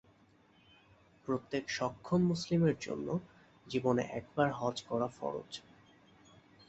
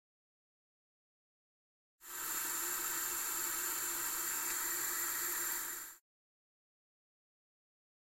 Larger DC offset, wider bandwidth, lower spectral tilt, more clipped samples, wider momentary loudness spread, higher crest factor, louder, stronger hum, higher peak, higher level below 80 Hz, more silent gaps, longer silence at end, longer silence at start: neither; second, 8.2 kHz vs 16.5 kHz; first, -6.5 dB/octave vs 1 dB/octave; neither; first, 10 LU vs 7 LU; about the same, 20 dB vs 18 dB; about the same, -35 LUFS vs -36 LUFS; neither; first, -16 dBFS vs -24 dBFS; first, -68 dBFS vs -74 dBFS; neither; second, 1.1 s vs 2 s; second, 1.25 s vs 2 s